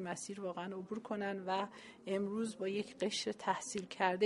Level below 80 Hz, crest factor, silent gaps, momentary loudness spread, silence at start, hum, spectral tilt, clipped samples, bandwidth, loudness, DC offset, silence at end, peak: -80 dBFS; 22 dB; none; 6 LU; 0 s; none; -4 dB/octave; under 0.1%; 11.5 kHz; -40 LUFS; under 0.1%; 0 s; -18 dBFS